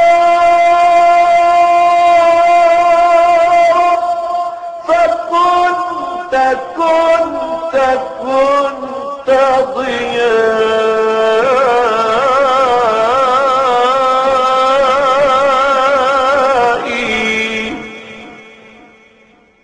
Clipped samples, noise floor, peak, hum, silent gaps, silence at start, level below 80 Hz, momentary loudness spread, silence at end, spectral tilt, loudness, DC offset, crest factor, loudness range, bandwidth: under 0.1%; -47 dBFS; -2 dBFS; none; none; 0 s; -46 dBFS; 9 LU; 1.2 s; -3.5 dB/octave; -11 LUFS; under 0.1%; 10 dB; 5 LU; 9.6 kHz